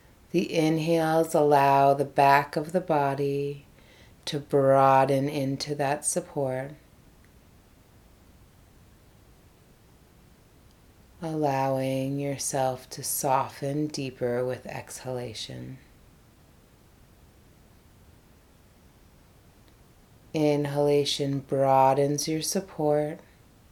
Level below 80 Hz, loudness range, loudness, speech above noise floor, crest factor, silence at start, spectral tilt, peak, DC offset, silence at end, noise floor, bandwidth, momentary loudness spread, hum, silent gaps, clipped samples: -60 dBFS; 15 LU; -26 LUFS; 31 dB; 22 dB; 0.35 s; -5 dB/octave; -6 dBFS; under 0.1%; 0.55 s; -57 dBFS; 19 kHz; 15 LU; none; none; under 0.1%